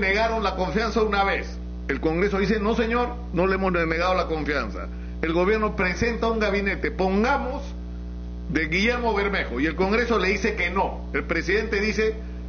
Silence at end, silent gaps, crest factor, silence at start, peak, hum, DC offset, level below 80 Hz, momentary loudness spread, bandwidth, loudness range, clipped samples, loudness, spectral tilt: 0 s; none; 16 dB; 0 s; -8 dBFS; 60 Hz at -35 dBFS; under 0.1%; -34 dBFS; 9 LU; 6.8 kHz; 1 LU; under 0.1%; -24 LUFS; -4 dB/octave